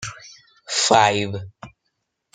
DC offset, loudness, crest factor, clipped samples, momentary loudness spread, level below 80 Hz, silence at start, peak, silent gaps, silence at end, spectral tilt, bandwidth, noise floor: under 0.1%; -18 LUFS; 22 dB; under 0.1%; 19 LU; -60 dBFS; 0 s; -2 dBFS; none; 0.65 s; -2.5 dB/octave; 9.6 kHz; -75 dBFS